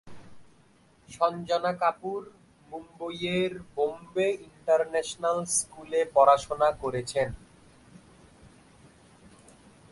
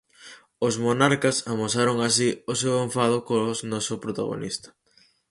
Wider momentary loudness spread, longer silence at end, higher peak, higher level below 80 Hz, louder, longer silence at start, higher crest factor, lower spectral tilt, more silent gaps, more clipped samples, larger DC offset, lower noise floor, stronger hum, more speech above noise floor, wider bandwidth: first, 17 LU vs 9 LU; first, 2.55 s vs 0.65 s; second, -8 dBFS vs -4 dBFS; about the same, -60 dBFS vs -62 dBFS; second, -27 LUFS vs -24 LUFS; second, 0.05 s vs 0.2 s; about the same, 22 dB vs 20 dB; about the same, -3.5 dB/octave vs -4 dB/octave; neither; neither; neither; about the same, -61 dBFS vs -61 dBFS; neither; second, 33 dB vs 37 dB; about the same, 11.5 kHz vs 11.5 kHz